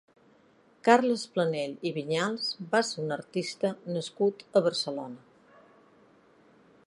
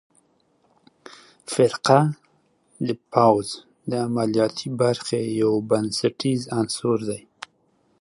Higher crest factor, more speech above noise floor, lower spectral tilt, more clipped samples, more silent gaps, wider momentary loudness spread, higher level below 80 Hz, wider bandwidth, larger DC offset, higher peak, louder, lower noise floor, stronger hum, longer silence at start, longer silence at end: about the same, 26 dB vs 22 dB; second, 34 dB vs 43 dB; about the same, -4.5 dB/octave vs -5.5 dB/octave; neither; neither; second, 11 LU vs 16 LU; second, -80 dBFS vs -64 dBFS; about the same, 11.5 kHz vs 11.5 kHz; neither; about the same, -4 dBFS vs -2 dBFS; second, -29 LUFS vs -22 LUFS; about the same, -62 dBFS vs -64 dBFS; neither; second, 0.85 s vs 1.5 s; first, 1.7 s vs 0.85 s